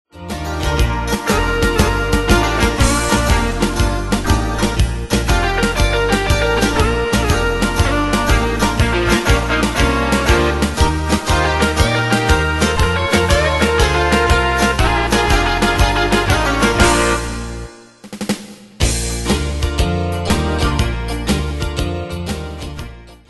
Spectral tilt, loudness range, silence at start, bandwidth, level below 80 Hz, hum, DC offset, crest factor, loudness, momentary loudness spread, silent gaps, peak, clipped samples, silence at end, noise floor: -4.5 dB/octave; 5 LU; 0.15 s; 12.5 kHz; -22 dBFS; none; under 0.1%; 16 dB; -16 LUFS; 9 LU; none; 0 dBFS; under 0.1%; 0.15 s; -35 dBFS